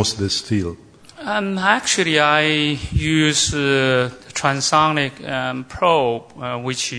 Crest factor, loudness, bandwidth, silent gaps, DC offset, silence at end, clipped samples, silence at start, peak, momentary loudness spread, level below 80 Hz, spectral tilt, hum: 20 dB; -18 LUFS; 11 kHz; none; under 0.1%; 0 s; under 0.1%; 0 s; 0 dBFS; 9 LU; -40 dBFS; -3.5 dB/octave; none